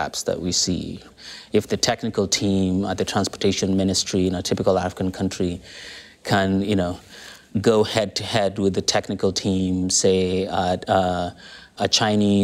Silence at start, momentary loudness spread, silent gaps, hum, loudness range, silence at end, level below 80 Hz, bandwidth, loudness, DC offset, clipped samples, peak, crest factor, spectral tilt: 0 s; 16 LU; none; none; 2 LU; 0 s; -50 dBFS; 15 kHz; -21 LUFS; under 0.1%; under 0.1%; -6 dBFS; 16 dB; -4 dB/octave